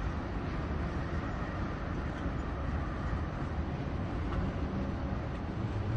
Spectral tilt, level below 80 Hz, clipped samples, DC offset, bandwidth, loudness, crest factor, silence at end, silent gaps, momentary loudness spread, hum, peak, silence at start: -8 dB/octave; -40 dBFS; under 0.1%; under 0.1%; 8 kHz; -36 LUFS; 14 dB; 0 s; none; 2 LU; none; -20 dBFS; 0 s